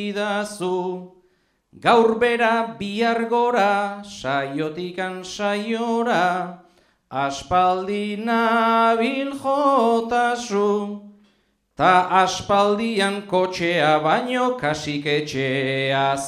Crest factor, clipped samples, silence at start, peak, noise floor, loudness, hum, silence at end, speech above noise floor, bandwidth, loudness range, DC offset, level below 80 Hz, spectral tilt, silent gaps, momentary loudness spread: 18 dB; under 0.1%; 0 s; -4 dBFS; -64 dBFS; -21 LUFS; none; 0 s; 44 dB; 13.5 kHz; 4 LU; under 0.1%; -58 dBFS; -4.5 dB/octave; none; 10 LU